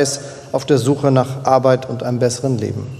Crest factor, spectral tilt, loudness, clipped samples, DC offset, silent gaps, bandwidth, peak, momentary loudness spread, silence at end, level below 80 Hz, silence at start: 16 dB; -6 dB/octave; -17 LUFS; under 0.1%; under 0.1%; none; 14 kHz; 0 dBFS; 9 LU; 0 s; -56 dBFS; 0 s